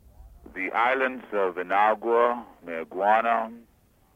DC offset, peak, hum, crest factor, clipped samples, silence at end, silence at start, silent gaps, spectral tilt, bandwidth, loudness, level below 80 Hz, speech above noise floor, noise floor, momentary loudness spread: under 0.1%; -8 dBFS; none; 18 dB; under 0.1%; 0.55 s; 0.2 s; none; -5.5 dB/octave; 15.5 kHz; -25 LUFS; -58 dBFS; 24 dB; -49 dBFS; 13 LU